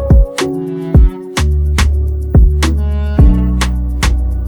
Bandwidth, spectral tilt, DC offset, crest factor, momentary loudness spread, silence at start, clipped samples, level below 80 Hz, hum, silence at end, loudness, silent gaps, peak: 13 kHz; -6 dB/octave; under 0.1%; 10 dB; 6 LU; 0 s; under 0.1%; -12 dBFS; none; 0 s; -13 LUFS; none; 0 dBFS